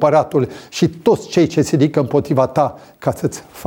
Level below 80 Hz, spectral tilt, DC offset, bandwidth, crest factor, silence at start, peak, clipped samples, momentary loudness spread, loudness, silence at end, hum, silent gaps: -50 dBFS; -6.5 dB/octave; under 0.1%; 18.5 kHz; 16 dB; 0 s; 0 dBFS; under 0.1%; 8 LU; -17 LUFS; 0 s; none; none